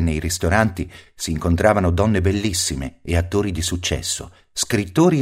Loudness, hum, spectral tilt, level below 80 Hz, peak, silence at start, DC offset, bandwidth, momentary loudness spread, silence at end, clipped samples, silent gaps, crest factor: -20 LUFS; none; -5 dB/octave; -34 dBFS; 0 dBFS; 0 s; under 0.1%; 16 kHz; 11 LU; 0 s; under 0.1%; none; 20 dB